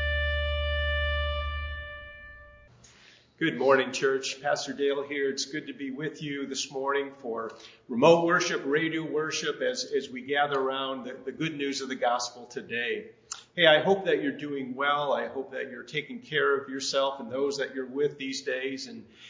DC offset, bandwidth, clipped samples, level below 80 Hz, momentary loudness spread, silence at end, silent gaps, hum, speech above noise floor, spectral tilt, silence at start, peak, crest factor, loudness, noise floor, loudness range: under 0.1%; 7.8 kHz; under 0.1%; -42 dBFS; 13 LU; 0 s; none; none; 28 dB; -4 dB/octave; 0 s; -6 dBFS; 24 dB; -28 LUFS; -57 dBFS; 4 LU